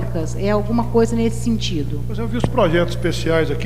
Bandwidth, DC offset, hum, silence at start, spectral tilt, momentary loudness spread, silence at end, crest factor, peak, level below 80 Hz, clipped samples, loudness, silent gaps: 15.5 kHz; 5%; 60 Hz at -25 dBFS; 0 s; -6.5 dB/octave; 7 LU; 0 s; 16 dB; -2 dBFS; -30 dBFS; under 0.1%; -20 LUFS; none